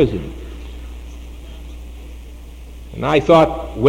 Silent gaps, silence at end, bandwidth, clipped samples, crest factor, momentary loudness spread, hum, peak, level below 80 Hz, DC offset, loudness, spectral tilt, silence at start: none; 0 s; 16.5 kHz; under 0.1%; 18 dB; 25 LU; none; 0 dBFS; -32 dBFS; under 0.1%; -15 LUFS; -7 dB/octave; 0 s